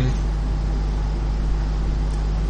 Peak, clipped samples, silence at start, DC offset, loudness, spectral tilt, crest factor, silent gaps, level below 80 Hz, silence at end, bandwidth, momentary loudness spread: -10 dBFS; under 0.1%; 0 s; under 0.1%; -25 LUFS; -7 dB/octave; 10 dB; none; -22 dBFS; 0 s; 8 kHz; 1 LU